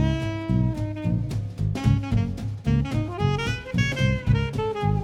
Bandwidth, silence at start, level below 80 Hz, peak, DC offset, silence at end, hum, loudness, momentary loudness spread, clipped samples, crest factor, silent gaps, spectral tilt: 11 kHz; 0 s; -34 dBFS; -6 dBFS; under 0.1%; 0 s; none; -25 LUFS; 5 LU; under 0.1%; 16 dB; none; -7 dB/octave